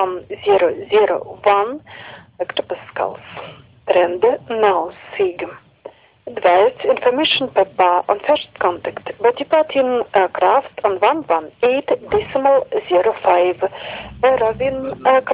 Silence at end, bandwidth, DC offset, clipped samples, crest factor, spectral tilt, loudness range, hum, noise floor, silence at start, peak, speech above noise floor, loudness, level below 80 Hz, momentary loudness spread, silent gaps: 0 s; 4 kHz; under 0.1%; under 0.1%; 16 dB; -8 dB/octave; 3 LU; none; -41 dBFS; 0 s; -2 dBFS; 24 dB; -17 LUFS; -52 dBFS; 13 LU; none